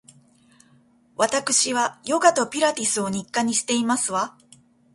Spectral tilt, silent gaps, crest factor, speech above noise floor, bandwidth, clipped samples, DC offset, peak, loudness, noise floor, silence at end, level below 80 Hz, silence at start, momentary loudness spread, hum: -2 dB/octave; none; 22 dB; 36 dB; 11.5 kHz; under 0.1%; under 0.1%; -2 dBFS; -22 LUFS; -58 dBFS; 0.65 s; -66 dBFS; 1.2 s; 6 LU; none